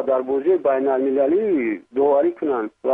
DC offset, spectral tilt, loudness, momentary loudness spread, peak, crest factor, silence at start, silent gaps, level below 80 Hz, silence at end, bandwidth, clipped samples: under 0.1%; -9 dB/octave; -20 LUFS; 6 LU; -8 dBFS; 12 dB; 0 s; none; -64 dBFS; 0 s; 3.8 kHz; under 0.1%